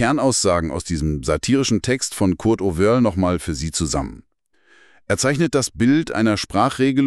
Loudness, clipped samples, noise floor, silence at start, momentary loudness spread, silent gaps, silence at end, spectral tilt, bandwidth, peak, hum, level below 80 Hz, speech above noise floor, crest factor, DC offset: -19 LUFS; under 0.1%; -58 dBFS; 0 s; 6 LU; none; 0 s; -5 dB/octave; 13 kHz; -4 dBFS; none; -38 dBFS; 40 dB; 16 dB; under 0.1%